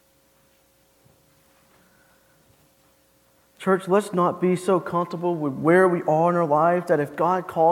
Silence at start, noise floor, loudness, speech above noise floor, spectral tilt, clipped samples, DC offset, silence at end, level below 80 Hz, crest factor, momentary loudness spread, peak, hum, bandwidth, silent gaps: 3.6 s; -61 dBFS; -22 LUFS; 40 dB; -7.5 dB/octave; under 0.1%; under 0.1%; 0 s; -68 dBFS; 18 dB; 8 LU; -6 dBFS; none; 15.5 kHz; none